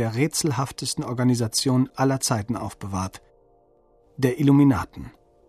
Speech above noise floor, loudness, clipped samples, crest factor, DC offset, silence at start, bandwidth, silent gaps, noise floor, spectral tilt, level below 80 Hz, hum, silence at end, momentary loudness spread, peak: 37 dB; -23 LUFS; under 0.1%; 16 dB; under 0.1%; 0 s; 14 kHz; none; -59 dBFS; -5.5 dB/octave; -52 dBFS; none; 0.4 s; 13 LU; -6 dBFS